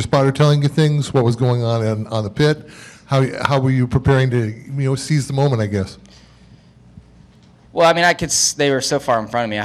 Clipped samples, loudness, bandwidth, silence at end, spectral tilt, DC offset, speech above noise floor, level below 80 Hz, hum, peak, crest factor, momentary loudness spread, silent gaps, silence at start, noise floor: under 0.1%; -17 LUFS; 13.5 kHz; 0 s; -5 dB/octave; under 0.1%; 31 dB; -46 dBFS; none; -2 dBFS; 16 dB; 8 LU; none; 0 s; -47 dBFS